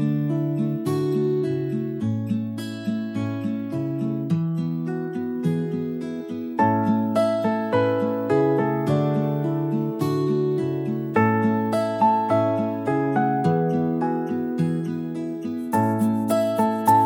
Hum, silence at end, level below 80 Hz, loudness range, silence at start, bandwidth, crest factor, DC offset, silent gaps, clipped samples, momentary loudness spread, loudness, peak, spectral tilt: none; 0 s; -66 dBFS; 5 LU; 0 s; 16.5 kHz; 16 dB; under 0.1%; none; under 0.1%; 7 LU; -23 LUFS; -6 dBFS; -8 dB/octave